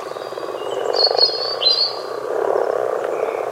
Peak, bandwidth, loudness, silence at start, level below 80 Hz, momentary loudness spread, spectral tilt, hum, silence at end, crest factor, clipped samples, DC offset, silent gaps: -2 dBFS; 16 kHz; -18 LUFS; 0 s; -72 dBFS; 13 LU; -2 dB/octave; none; 0 s; 20 dB; under 0.1%; under 0.1%; none